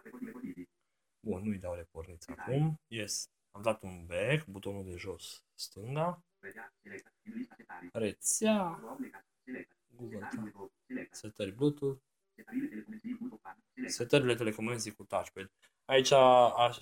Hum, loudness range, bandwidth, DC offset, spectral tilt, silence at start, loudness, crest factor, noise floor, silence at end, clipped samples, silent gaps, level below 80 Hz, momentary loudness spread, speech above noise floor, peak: none; 6 LU; over 20 kHz; under 0.1%; -4.5 dB/octave; 0.05 s; -33 LUFS; 22 dB; -86 dBFS; 0 s; under 0.1%; none; -70 dBFS; 20 LU; 53 dB; -12 dBFS